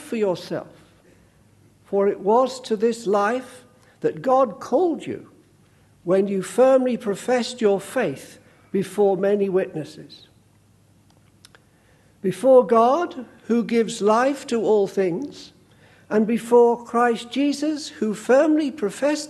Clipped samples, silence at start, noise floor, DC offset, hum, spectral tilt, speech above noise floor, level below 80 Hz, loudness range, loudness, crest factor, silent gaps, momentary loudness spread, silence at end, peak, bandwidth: under 0.1%; 0 s; -57 dBFS; under 0.1%; none; -5.5 dB/octave; 36 dB; -68 dBFS; 5 LU; -21 LUFS; 18 dB; none; 13 LU; 0 s; -4 dBFS; 12.5 kHz